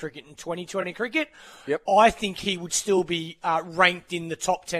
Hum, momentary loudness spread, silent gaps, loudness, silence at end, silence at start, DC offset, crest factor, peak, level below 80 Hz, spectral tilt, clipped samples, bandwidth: none; 15 LU; none; -24 LUFS; 0 s; 0 s; under 0.1%; 22 dB; -2 dBFS; -56 dBFS; -3 dB/octave; under 0.1%; 14 kHz